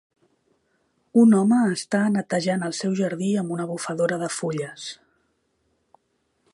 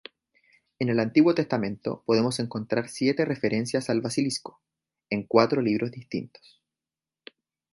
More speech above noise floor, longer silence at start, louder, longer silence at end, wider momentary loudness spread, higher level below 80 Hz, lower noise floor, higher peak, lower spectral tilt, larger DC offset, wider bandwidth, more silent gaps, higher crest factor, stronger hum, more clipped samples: second, 49 dB vs over 65 dB; first, 1.15 s vs 0.8 s; first, -22 LUFS vs -26 LUFS; about the same, 1.6 s vs 1.5 s; about the same, 12 LU vs 12 LU; second, -72 dBFS vs -66 dBFS; second, -71 dBFS vs under -90 dBFS; about the same, -6 dBFS vs -4 dBFS; about the same, -5.5 dB/octave vs -5.5 dB/octave; neither; about the same, 11.5 kHz vs 11.5 kHz; neither; second, 18 dB vs 24 dB; neither; neither